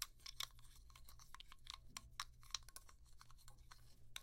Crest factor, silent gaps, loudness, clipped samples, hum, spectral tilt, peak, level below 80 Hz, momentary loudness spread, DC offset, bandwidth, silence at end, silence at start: 34 dB; none; -54 LUFS; under 0.1%; none; 0 dB/octave; -22 dBFS; -64 dBFS; 16 LU; under 0.1%; 16.5 kHz; 0 s; 0 s